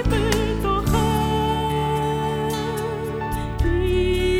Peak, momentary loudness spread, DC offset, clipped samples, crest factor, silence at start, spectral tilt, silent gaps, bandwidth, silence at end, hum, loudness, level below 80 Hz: -6 dBFS; 6 LU; under 0.1%; under 0.1%; 16 dB; 0 s; -6 dB/octave; none; over 20 kHz; 0 s; none; -22 LUFS; -28 dBFS